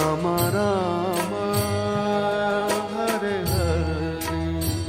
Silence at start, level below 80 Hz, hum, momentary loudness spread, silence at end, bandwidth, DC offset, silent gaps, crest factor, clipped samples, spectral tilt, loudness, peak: 0 s; -38 dBFS; none; 4 LU; 0 s; 16 kHz; under 0.1%; none; 16 dB; under 0.1%; -5.5 dB/octave; -24 LUFS; -8 dBFS